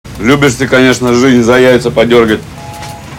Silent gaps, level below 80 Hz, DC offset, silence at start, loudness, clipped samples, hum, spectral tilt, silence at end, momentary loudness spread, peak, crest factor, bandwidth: none; -34 dBFS; under 0.1%; 0.05 s; -8 LUFS; 3%; none; -5 dB/octave; 0 s; 18 LU; 0 dBFS; 8 dB; 17 kHz